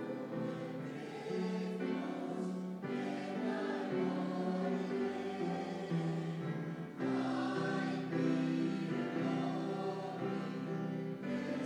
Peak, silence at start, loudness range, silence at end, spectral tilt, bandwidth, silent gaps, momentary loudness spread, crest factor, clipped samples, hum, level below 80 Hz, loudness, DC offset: -24 dBFS; 0 s; 3 LU; 0 s; -7.5 dB/octave; 11 kHz; none; 5 LU; 14 dB; under 0.1%; none; -80 dBFS; -38 LUFS; under 0.1%